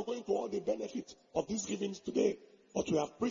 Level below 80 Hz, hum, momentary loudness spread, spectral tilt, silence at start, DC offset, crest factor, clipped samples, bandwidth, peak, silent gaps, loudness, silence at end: -68 dBFS; none; 8 LU; -5.5 dB/octave; 0 s; under 0.1%; 18 dB; under 0.1%; 7.2 kHz; -18 dBFS; none; -36 LUFS; 0 s